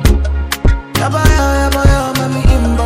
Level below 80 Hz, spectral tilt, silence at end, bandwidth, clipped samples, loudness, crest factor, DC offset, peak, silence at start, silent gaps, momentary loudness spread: -14 dBFS; -5.5 dB/octave; 0 s; 16.5 kHz; 0.5%; -13 LUFS; 10 dB; under 0.1%; 0 dBFS; 0 s; none; 4 LU